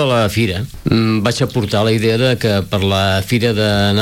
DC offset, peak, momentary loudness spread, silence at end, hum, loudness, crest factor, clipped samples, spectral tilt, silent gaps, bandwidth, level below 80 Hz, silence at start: under 0.1%; -2 dBFS; 3 LU; 0 s; none; -15 LUFS; 12 dB; under 0.1%; -5.5 dB/octave; none; 16.5 kHz; -40 dBFS; 0 s